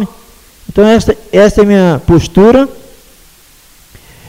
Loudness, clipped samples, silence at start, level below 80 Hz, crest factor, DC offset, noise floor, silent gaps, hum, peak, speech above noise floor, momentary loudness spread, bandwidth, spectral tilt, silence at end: -8 LUFS; 0.3%; 0 s; -28 dBFS; 10 dB; under 0.1%; -42 dBFS; none; none; 0 dBFS; 35 dB; 9 LU; 16 kHz; -6.5 dB/octave; 1.55 s